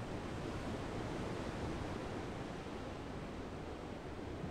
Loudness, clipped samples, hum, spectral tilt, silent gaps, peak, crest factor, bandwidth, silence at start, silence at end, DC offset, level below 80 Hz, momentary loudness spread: -44 LUFS; under 0.1%; none; -6 dB/octave; none; -30 dBFS; 14 dB; 15.5 kHz; 0 s; 0 s; under 0.1%; -54 dBFS; 4 LU